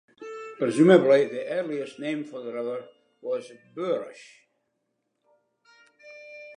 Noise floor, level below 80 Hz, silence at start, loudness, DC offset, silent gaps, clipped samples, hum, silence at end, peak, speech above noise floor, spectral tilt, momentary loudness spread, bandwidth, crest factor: -78 dBFS; -82 dBFS; 0.2 s; -25 LUFS; under 0.1%; none; under 0.1%; none; 0.05 s; -4 dBFS; 53 dB; -6.5 dB/octave; 24 LU; 10.5 kHz; 22 dB